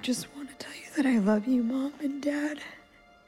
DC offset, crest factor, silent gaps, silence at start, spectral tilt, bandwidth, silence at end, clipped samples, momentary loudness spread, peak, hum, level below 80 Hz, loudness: under 0.1%; 14 dB; none; 0 s; -5 dB/octave; 14.5 kHz; 0.5 s; under 0.1%; 16 LU; -16 dBFS; none; -68 dBFS; -29 LUFS